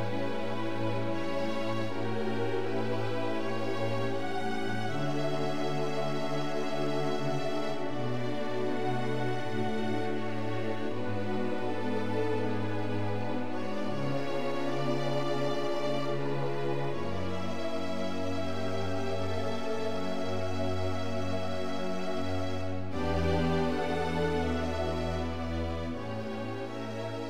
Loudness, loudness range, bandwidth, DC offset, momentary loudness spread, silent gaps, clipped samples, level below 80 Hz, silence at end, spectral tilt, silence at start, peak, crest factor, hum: -33 LUFS; 2 LU; 16 kHz; 3%; 4 LU; none; under 0.1%; -50 dBFS; 0 s; -6.5 dB/octave; 0 s; -18 dBFS; 14 dB; none